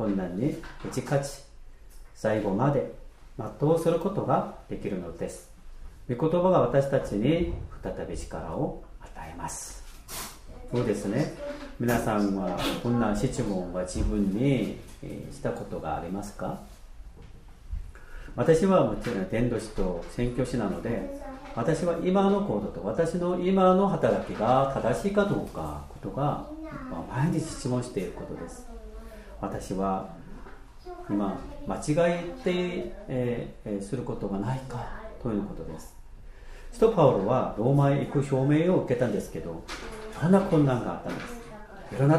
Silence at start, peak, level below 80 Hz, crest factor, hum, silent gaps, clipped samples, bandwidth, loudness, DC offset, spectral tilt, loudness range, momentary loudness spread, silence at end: 0 s; -8 dBFS; -44 dBFS; 20 dB; none; none; under 0.1%; 15.5 kHz; -28 LUFS; under 0.1%; -7 dB/octave; 9 LU; 18 LU; 0 s